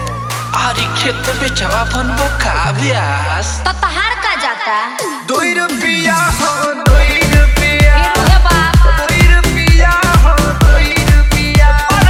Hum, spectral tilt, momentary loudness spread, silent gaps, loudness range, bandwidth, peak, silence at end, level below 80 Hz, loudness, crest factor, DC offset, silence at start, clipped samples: none; -4.5 dB/octave; 6 LU; none; 5 LU; 16 kHz; 0 dBFS; 0 s; -14 dBFS; -12 LUFS; 10 dB; under 0.1%; 0 s; 0.2%